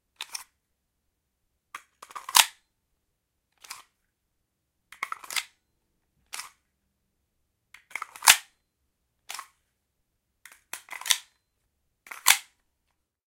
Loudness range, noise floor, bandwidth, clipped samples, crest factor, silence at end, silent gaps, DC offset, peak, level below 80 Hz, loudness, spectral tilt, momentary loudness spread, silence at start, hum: 12 LU; -79 dBFS; 17 kHz; under 0.1%; 32 dB; 0.85 s; none; under 0.1%; 0 dBFS; -76 dBFS; -23 LUFS; 3.5 dB/octave; 25 LU; 0.2 s; none